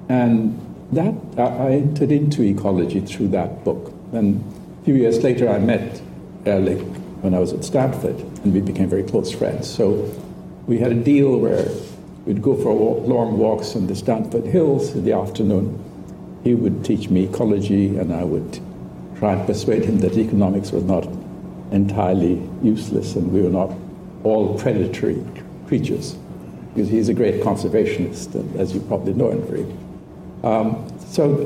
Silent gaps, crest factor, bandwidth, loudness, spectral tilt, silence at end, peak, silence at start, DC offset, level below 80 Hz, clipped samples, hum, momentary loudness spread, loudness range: none; 14 dB; 15 kHz; -20 LUFS; -8 dB/octave; 0 s; -6 dBFS; 0 s; under 0.1%; -48 dBFS; under 0.1%; none; 14 LU; 2 LU